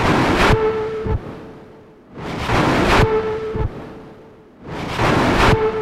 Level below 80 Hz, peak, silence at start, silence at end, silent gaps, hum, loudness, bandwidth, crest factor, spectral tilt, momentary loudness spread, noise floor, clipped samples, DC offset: -28 dBFS; -2 dBFS; 0 s; 0 s; none; none; -17 LUFS; 15.5 kHz; 16 dB; -6 dB/octave; 20 LU; -43 dBFS; under 0.1%; under 0.1%